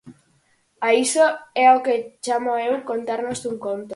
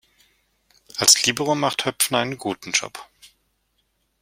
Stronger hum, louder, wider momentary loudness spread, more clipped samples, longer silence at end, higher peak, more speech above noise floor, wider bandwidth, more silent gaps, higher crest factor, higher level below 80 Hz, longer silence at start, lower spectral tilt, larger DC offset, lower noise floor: neither; about the same, -20 LUFS vs -19 LUFS; second, 11 LU vs 18 LU; neither; second, 0 s vs 0.95 s; second, -4 dBFS vs 0 dBFS; second, 43 dB vs 49 dB; second, 11.5 kHz vs 16.5 kHz; neither; second, 18 dB vs 24 dB; about the same, -66 dBFS vs -64 dBFS; second, 0.05 s vs 0.95 s; about the same, -2.5 dB/octave vs -1.5 dB/octave; neither; second, -63 dBFS vs -70 dBFS